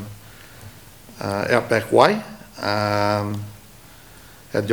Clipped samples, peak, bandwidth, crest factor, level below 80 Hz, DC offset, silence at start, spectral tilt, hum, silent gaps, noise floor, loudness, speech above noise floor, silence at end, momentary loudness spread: under 0.1%; 0 dBFS; over 20 kHz; 22 dB; -54 dBFS; 0.2%; 0 s; -5.5 dB/octave; none; none; -46 dBFS; -21 LUFS; 26 dB; 0 s; 26 LU